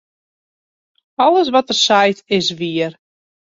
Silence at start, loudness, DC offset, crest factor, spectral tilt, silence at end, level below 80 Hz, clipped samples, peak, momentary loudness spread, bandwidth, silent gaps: 1.2 s; -15 LUFS; under 0.1%; 16 dB; -3.5 dB/octave; 0.5 s; -62 dBFS; under 0.1%; -2 dBFS; 10 LU; 7.8 kHz; none